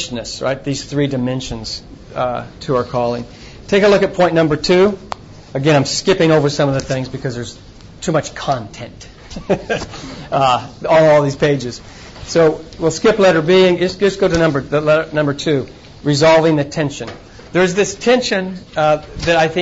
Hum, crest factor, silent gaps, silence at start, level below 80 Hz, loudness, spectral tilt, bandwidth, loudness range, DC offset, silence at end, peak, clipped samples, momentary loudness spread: none; 12 dB; none; 0 s; -40 dBFS; -15 LUFS; -5 dB/octave; 8 kHz; 6 LU; under 0.1%; 0 s; -4 dBFS; under 0.1%; 17 LU